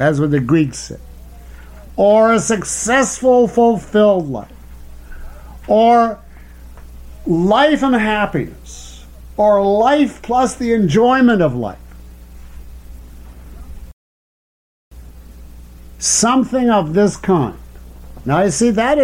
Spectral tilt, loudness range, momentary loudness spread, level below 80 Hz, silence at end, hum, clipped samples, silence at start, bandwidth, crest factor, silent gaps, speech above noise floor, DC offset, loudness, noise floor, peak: -5 dB/octave; 5 LU; 17 LU; -38 dBFS; 0 s; none; under 0.1%; 0 s; 16.5 kHz; 14 dB; 13.93-14.91 s; 23 dB; under 0.1%; -14 LUFS; -36 dBFS; -2 dBFS